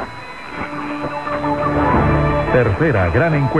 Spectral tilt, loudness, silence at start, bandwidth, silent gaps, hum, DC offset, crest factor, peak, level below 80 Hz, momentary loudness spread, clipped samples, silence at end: -8.5 dB/octave; -17 LUFS; 0 s; 10 kHz; none; none; 1%; 14 dB; -2 dBFS; -30 dBFS; 12 LU; under 0.1%; 0 s